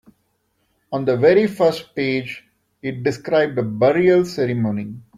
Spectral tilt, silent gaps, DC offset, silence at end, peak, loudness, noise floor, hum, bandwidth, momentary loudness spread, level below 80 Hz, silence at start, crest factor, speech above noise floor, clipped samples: -7 dB/octave; none; under 0.1%; 0.15 s; -2 dBFS; -19 LUFS; -67 dBFS; none; 14 kHz; 14 LU; -58 dBFS; 0.9 s; 16 dB; 49 dB; under 0.1%